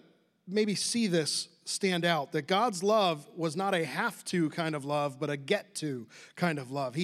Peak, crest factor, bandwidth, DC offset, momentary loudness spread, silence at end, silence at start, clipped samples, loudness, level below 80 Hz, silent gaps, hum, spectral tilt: -12 dBFS; 18 dB; 15 kHz; under 0.1%; 8 LU; 0 s; 0.45 s; under 0.1%; -30 LUFS; -88 dBFS; none; none; -4 dB/octave